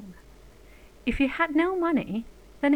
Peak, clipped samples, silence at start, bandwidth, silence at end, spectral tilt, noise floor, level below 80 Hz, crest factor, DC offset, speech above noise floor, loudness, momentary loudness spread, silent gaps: -10 dBFS; under 0.1%; 0 s; 10.5 kHz; 0 s; -6.5 dB/octave; -51 dBFS; -46 dBFS; 18 dB; 0.1%; 26 dB; -27 LUFS; 15 LU; none